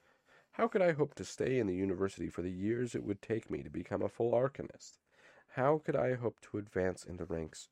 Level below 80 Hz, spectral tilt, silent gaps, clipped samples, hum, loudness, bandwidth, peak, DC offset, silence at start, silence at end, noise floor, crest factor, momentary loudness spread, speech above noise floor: -64 dBFS; -6.5 dB/octave; none; under 0.1%; none; -36 LUFS; 11.5 kHz; -16 dBFS; under 0.1%; 0.55 s; 0.05 s; -68 dBFS; 20 dB; 12 LU; 32 dB